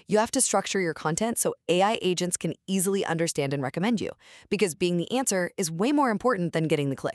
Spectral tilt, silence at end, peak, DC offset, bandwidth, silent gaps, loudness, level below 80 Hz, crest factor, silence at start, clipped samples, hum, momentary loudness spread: -4 dB/octave; 0 s; -10 dBFS; under 0.1%; 13.5 kHz; none; -26 LUFS; -64 dBFS; 16 dB; 0.1 s; under 0.1%; none; 5 LU